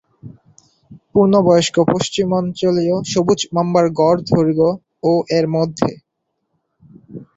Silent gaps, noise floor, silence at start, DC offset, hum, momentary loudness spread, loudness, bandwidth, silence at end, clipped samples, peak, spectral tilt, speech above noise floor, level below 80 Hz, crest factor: none; -73 dBFS; 0.25 s; under 0.1%; none; 7 LU; -16 LUFS; 8 kHz; 0.1 s; under 0.1%; -2 dBFS; -6 dB/octave; 58 dB; -52 dBFS; 16 dB